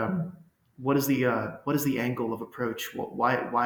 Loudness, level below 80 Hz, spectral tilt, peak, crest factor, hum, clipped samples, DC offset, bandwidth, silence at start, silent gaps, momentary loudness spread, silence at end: -29 LUFS; -66 dBFS; -5.5 dB/octave; -10 dBFS; 18 dB; none; under 0.1%; under 0.1%; over 20 kHz; 0 s; none; 9 LU; 0 s